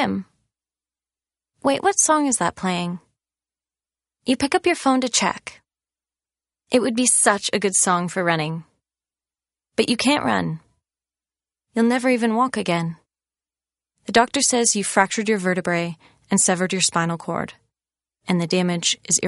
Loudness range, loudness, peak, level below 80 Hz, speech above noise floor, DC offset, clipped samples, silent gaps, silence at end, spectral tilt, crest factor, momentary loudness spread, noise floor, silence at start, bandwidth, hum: 4 LU; -20 LUFS; 0 dBFS; -62 dBFS; over 70 dB; under 0.1%; under 0.1%; none; 0 s; -3 dB/octave; 22 dB; 13 LU; under -90 dBFS; 0 s; 11.5 kHz; none